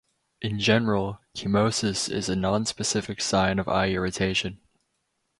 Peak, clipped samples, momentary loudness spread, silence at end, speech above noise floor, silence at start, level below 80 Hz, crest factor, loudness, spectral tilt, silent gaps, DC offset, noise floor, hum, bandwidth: -6 dBFS; under 0.1%; 9 LU; 0.85 s; 51 dB; 0.4 s; -48 dBFS; 20 dB; -25 LUFS; -4 dB/octave; none; under 0.1%; -76 dBFS; none; 11.5 kHz